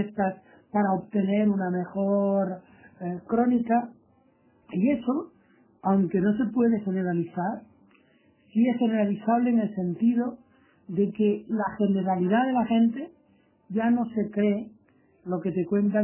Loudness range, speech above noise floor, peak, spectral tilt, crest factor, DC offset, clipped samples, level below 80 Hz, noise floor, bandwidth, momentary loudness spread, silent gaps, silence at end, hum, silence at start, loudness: 2 LU; 38 dB; -10 dBFS; -7.5 dB/octave; 16 dB; under 0.1%; under 0.1%; -66 dBFS; -63 dBFS; 3.2 kHz; 10 LU; none; 0 s; none; 0 s; -26 LUFS